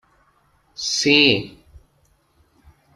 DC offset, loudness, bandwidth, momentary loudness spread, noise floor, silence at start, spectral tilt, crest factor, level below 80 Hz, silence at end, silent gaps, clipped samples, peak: under 0.1%; -16 LUFS; 12.5 kHz; 25 LU; -62 dBFS; 0.8 s; -2.5 dB/octave; 22 dB; -56 dBFS; 1.45 s; none; under 0.1%; 0 dBFS